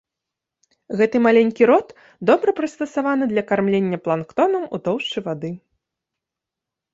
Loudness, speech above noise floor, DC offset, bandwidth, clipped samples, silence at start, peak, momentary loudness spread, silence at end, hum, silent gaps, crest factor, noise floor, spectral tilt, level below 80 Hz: -19 LUFS; 66 dB; under 0.1%; 7.8 kHz; under 0.1%; 0.9 s; -2 dBFS; 11 LU; 1.35 s; none; none; 18 dB; -85 dBFS; -6.5 dB/octave; -64 dBFS